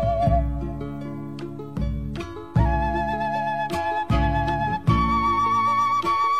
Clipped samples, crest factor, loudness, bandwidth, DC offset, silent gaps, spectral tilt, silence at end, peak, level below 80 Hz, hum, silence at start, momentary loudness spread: under 0.1%; 16 dB; -24 LUFS; 13 kHz; 0.6%; none; -7 dB/octave; 0 s; -6 dBFS; -30 dBFS; none; 0 s; 13 LU